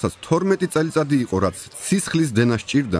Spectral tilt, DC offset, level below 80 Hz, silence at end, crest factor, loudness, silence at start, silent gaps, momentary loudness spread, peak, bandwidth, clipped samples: -5.5 dB/octave; under 0.1%; -50 dBFS; 0 s; 16 dB; -21 LUFS; 0 s; none; 4 LU; -4 dBFS; 11 kHz; under 0.1%